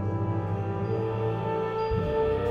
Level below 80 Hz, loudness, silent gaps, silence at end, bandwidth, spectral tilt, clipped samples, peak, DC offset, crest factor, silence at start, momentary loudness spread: -44 dBFS; -29 LUFS; none; 0 s; 6.4 kHz; -9 dB/octave; under 0.1%; -14 dBFS; under 0.1%; 14 dB; 0 s; 3 LU